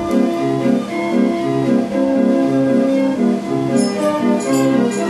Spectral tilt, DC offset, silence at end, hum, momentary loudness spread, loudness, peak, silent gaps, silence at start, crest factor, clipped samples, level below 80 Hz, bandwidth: -6.5 dB/octave; under 0.1%; 0 s; none; 3 LU; -16 LUFS; -2 dBFS; none; 0 s; 12 dB; under 0.1%; -54 dBFS; 13.5 kHz